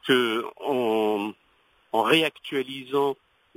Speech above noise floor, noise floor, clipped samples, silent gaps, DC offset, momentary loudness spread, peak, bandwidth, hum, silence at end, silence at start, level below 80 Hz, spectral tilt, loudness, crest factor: 39 dB; -63 dBFS; under 0.1%; none; under 0.1%; 9 LU; -6 dBFS; 16 kHz; none; 0.45 s; 0.05 s; -74 dBFS; -4.5 dB/octave; -25 LUFS; 18 dB